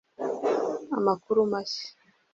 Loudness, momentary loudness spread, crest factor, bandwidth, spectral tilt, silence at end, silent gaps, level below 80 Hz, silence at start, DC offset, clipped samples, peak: -28 LUFS; 9 LU; 18 dB; 7.6 kHz; -5.5 dB/octave; 0.45 s; none; -72 dBFS; 0.2 s; under 0.1%; under 0.1%; -10 dBFS